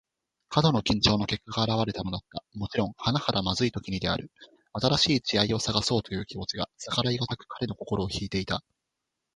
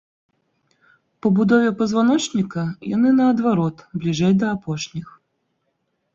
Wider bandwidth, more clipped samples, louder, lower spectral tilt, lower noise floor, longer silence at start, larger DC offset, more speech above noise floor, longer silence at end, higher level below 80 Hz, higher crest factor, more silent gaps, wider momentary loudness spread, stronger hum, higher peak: first, 11.5 kHz vs 8 kHz; neither; second, -28 LUFS vs -19 LUFS; second, -5 dB/octave vs -6.5 dB/octave; first, -84 dBFS vs -72 dBFS; second, 0.5 s vs 1.25 s; neither; about the same, 56 dB vs 53 dB; second, 0.75 s vs 1.1 s; first, -50 dBFS vs -58 dBFS; first, 22 dB vs 16 dB; neither; about the same, 11 LU vs 11 LU; neither; about the same, -6 dBFS vs -4 dBFS